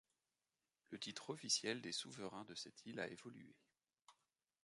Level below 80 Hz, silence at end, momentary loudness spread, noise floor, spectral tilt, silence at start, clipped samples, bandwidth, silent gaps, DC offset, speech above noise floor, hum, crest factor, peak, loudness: -88 dBFS; 0.5 s; 18 LU; under -90 dBFS; -2 dB/octave; 0.9 s; under 0.1%; 11.5 kHz; none; under 0.1%; over 41 dB; none; 24 dB; -26 dBFS; -46 LUFS